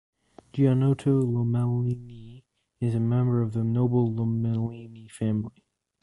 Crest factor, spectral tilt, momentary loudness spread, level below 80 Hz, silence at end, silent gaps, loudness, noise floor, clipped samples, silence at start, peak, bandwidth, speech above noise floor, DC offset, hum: 16 dB; -10 dB/octave; 14 LU; -54 dBFS; 0.55 s; none; -26 LUFS; -53 dBFS; under 0.1%; 0.55 s; -10 dBFS; 11.5 kHz; 28 dB; under 0.1%; none